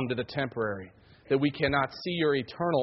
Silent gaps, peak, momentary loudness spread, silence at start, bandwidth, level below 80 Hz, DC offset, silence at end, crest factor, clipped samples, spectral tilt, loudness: none; -12 dBFS; 7 LU; 0 s; 6 kHz; -58 dBFS; under 0.1%; 0 s; 18 dB; under 0.1%; -4.5 dB/octave; -29 LUFS